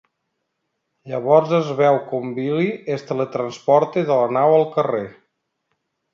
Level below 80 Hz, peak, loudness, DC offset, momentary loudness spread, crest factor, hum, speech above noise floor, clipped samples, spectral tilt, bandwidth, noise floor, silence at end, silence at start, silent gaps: -70 dBFS; 0 dBFS; -19 LUFS; under 0.1%; 11 LU; 20 dB; none; 57 dB; under 0.1%; -7.5 dB/octave; 7.4 kHz; -75 dBFS; 1 s; 1.05 s; none